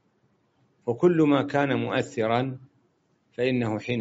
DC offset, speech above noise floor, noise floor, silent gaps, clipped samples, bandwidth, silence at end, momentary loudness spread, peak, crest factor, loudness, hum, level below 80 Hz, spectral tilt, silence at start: under 0.1%; 44 dB; -68 dBFS; none; under 0.1%; 8 kHz; 0 s; 13 LU; -8 dBFS; 18 dB; -25 LUFS; none; -66 dBFS; -5.5 dB/octave; 0.85 s